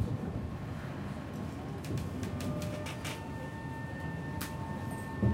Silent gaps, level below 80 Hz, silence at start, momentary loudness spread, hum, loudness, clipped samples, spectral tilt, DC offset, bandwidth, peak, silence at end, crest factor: none; -50 dBFS; 0 s; 4 LU; none; -39 LUFS; under 0.1%; -6.5 dB/octave; under 0.1%; 16.5 kHz; -18 dBFS; 0 s; 18 dB